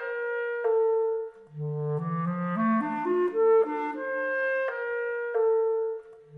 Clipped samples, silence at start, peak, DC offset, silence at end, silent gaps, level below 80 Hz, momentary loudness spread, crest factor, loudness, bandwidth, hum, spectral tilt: under 0.1%; 0 s; -16 dBFS; under 0.1%; 0 s; none; -76 dBFS; 9 LU; 12 dB; -27 LUFS; 3.9 kHz; none; -9.5 dB/octave